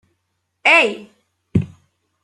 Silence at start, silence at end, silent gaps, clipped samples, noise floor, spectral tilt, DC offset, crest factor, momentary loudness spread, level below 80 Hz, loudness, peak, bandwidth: 0.65 s; 0.55 s; none; under 0.1%; -72 dBFS; -5 dB/octave; under 0.1%; 20 dB; 19 LU; -50 dBFS; -16 LUFS; -2 dBFS; 12 kHz